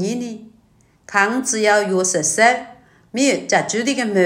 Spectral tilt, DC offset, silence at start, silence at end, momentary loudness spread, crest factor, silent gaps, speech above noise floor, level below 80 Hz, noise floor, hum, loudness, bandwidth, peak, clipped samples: -3 dB/octave; under 0.1%; 0 s; 0 s; 12 LU; 18 dB; none; 38 dB; -64 dBFS; -55 dBFS; none; -17 LUFS; 16.5 kHz; 0 dBFS; under 0.1%